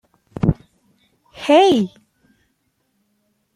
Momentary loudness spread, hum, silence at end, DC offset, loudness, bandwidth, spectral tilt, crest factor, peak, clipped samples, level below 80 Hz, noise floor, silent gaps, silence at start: 18 LU; none; 1.7 s; under 0.1%; -17 LUFS; 13 kHz; -6.5 dB/octave; 20 dB; -2 dBFS; under 0.1%; -42 dBFS; -68 dBFS; none; 0.4 s